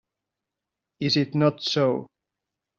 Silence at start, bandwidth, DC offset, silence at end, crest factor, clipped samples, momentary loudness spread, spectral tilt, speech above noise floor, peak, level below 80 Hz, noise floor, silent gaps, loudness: 1 s; 7.4 kHz; under 0.1%; 0.75 s; 20 dB; under 0.1%; 7 LU; -6 dB/octave; 63 dB; -8 dBFS; -66 dBFS; -86 dBFS; none; -24 LUFS